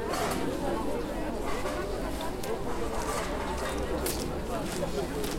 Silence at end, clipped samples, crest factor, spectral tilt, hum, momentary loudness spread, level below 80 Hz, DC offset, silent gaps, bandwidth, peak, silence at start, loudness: 0 s; under 0.1%; 16 dB; -4.5 dB/octave; none; 3 LU; -40 dBFS; 0.2%; none; 16.5 kHz; -16 dBFS; 0 s; -33 LUFS